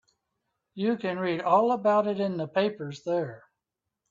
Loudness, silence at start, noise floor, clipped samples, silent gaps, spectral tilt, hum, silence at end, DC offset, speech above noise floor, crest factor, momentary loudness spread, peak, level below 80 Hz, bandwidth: -27 LUFS; 0.75 s; -86 dBFS; under 0.1%; none; -7 dB/octave; none; 0.75 s; under 0.1%; 60 dB; 20 dB; 9 LU; -10 dBFS; -74 dBFS; 7.6 kHz